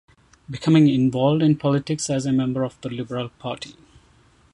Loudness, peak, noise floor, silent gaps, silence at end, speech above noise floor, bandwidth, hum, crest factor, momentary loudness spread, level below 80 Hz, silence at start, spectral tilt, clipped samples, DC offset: -21 LUFS; -4 dBFS; -56 dBFS; none; 0.8 s; 35 dB; 11.5 kHz; none; 18 dB; 15 LU; -56 dBFS; 0.5 s; -6.5 dB/octave; under 0.1%; under 0.1%